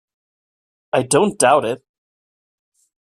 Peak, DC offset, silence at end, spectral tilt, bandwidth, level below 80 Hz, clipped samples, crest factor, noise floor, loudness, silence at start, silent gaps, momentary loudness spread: -2 dBFS; under 0.1%; 1.35 s; -3.5 dB/octave; 15 kHz; -62 dBFS; under 0.1%; 20 dB; under -90 dBFS; -17 LUFS; 0.95 s; none; 11 LU